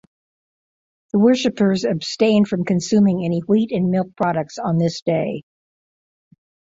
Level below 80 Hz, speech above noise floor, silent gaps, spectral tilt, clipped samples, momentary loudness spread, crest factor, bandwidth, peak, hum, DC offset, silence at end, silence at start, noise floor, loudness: -58 dBFS; over 72 dB; 5.02-5.06 s; -6.5 dB/octave; under 0.1%; 6 LU; 16 dB; 7.8 kHz; -4 dBFS; none; under 0.1%; 1.35 s; 1.15 s; under -90 dBFS; -19 LUFS